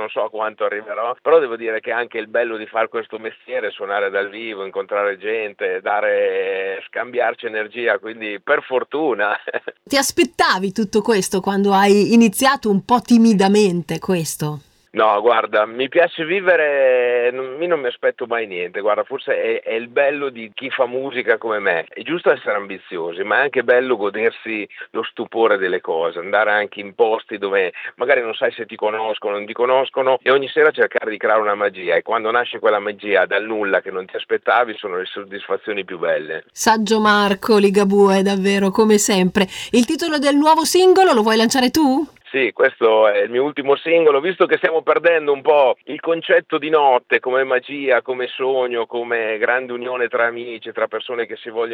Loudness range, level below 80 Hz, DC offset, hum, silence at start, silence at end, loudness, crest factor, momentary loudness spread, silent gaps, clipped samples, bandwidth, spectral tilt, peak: 6 LU; -60 dBFS; under 0.1%; none; 0 s; 0 s; -18 LUFS; 16 dB; 11 LU; none; under 0.1%; 17 kHz; -4 dB/octave; -2 dBFS